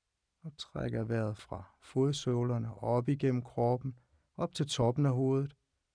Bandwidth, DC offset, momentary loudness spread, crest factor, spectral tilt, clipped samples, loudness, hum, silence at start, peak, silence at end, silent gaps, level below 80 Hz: 10.5 kHz; under 0.1%; 16 LU; 16 dB; -7 dB/octave; under 0.1%; -33 LUFS; none; 0.45 s; -16 dBFS; 0.45 s; none; -62 dBFS